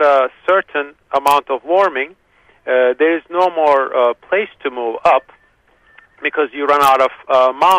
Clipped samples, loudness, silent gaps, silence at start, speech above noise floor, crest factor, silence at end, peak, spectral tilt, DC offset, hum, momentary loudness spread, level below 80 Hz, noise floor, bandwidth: under 0.1%; -15 LUFS; none; 0 s; 40 dB; 16 dB; 0 s; 0 dBFS; -3.5 dB/octave; under 0.1%; none; 10 LU; -58 dBFS; -55 dBFS; 15.5 kHz